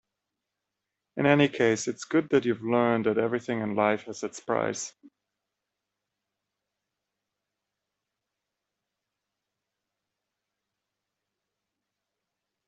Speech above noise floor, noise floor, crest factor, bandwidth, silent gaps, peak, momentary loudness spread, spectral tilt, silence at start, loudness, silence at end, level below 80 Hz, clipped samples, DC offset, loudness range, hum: 60 dB; -86 dBFS; 26 dB; 8.2 kHz; none; -6 dBFS; 13 LU; -5 dB/octave; 1.15 s; -26 LUFS; 7.8 s; -72 dBFS; under 0.1%; under 0.1%; 12 LU; none